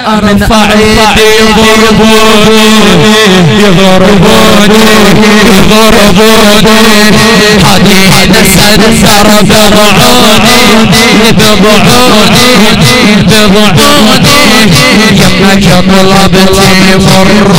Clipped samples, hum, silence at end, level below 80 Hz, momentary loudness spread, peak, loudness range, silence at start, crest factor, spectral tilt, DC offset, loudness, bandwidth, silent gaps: 30%; none; 0 s; -20 dBFS; 1 LU; 0 dBFS; 1 LU; 0 s; 4 dB; -4 dB/octave; 30%; -2 LUFS; over 20 kHz; none